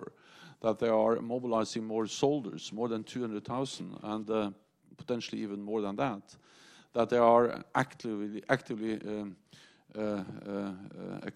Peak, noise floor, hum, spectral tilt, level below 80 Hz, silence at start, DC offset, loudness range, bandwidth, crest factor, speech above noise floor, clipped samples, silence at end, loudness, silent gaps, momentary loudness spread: -10 dBFS; -56 dBFS; none; -5.5 dB/octave; -72 dBFS; 0 s; under 0.1%; 6 LU; 11.5 kHz; 24 dB; 24 dB; under 0.1%; 0.05 s; -33 LUFS; none; 13 LU